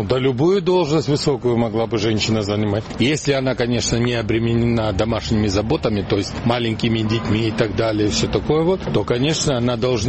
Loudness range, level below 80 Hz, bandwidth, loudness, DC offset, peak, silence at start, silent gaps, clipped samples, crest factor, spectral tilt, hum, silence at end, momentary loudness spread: 1 LU; -38 dBFS; 8.8 kHz; -19 LUFS; 0.2%; -2 dBFS; 0 s; none; under 0.1%; 16 dB; -5.5 dB/octave; none; 0 s; 3 LU